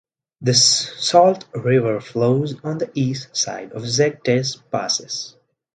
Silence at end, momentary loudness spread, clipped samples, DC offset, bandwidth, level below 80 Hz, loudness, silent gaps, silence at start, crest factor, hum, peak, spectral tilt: 0.45 s; 11 LU; under 0.1%; under 0.1%; 11 kHz; -62 dBFS; -19 LUFS; none; 0.4 s; 20 dB; none; 0 dBFS; -3.5 dB/octave